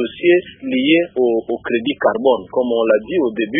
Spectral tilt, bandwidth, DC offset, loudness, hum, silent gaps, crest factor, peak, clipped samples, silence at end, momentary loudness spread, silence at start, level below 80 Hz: -10.5 dB/octave; 3.8 kHz; under 0.1%; -17 LUFS; none; none; 14 dB; -2 dBFS; under 0.1%; 0 s; 5 LU; 0 s; -56 dBFS